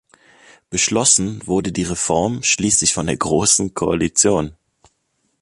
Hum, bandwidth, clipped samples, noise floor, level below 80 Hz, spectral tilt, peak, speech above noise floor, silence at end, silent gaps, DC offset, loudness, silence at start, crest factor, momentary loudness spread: none; 11.5 kHz; under 0.1%; -68 dBFS; -44 dBFS; -3 dB/octave; 0 dBFS; 50 dB; 0.9 s; none; under 0.1%; -16 LUFS; 0.7 s; 20 dB; 8 LU